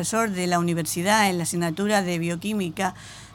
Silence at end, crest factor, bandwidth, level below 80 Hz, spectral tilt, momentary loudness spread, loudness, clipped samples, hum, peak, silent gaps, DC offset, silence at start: 0 s; 16 dB; 18 kHz; -58 dBFS; -4 dB/octave; 8 LU; -24 LUFS; under 0.1%; none; -8 dBFS; none; under 0.1%; 0 s